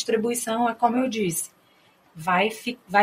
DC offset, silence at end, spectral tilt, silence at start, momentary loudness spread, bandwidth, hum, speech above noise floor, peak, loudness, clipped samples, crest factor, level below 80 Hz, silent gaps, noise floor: under 0.1%; 0 s; -3.5 dB/octave; 0 s; 9 LU; 16 kHz; none; 36 dB; -4 dBFS; -24 LUFS; under 0.1%; 20 dB; -68 dBFS; none; -59 dBFS